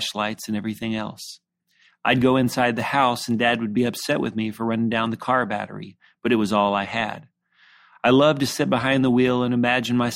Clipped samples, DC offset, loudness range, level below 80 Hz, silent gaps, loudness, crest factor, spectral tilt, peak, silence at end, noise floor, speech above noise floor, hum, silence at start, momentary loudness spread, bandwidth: under 0.1%; under 0.1%; 3 LU; -58 dBFS; none; -22 LUFS; 18 dB; -5 dB/octave; -4 dBFS; 0 s; -61 dBFS; 40 dB; none; 0 s; 11 LU; 16 kHz